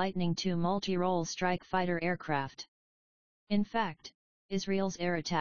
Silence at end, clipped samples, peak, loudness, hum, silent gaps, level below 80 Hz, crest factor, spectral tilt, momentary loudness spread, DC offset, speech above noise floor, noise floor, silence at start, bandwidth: 0 s; under 0.1%; -16 dBFS; -33 LUFS; none; 2.68-3.47 s, 4.14-4.49 s; -62 dBFS; 18 dB; -4.5 dB/octave; 10 LU; 0.5%; over 58 dB; under -90 dBFS; 0 s; 7 kHz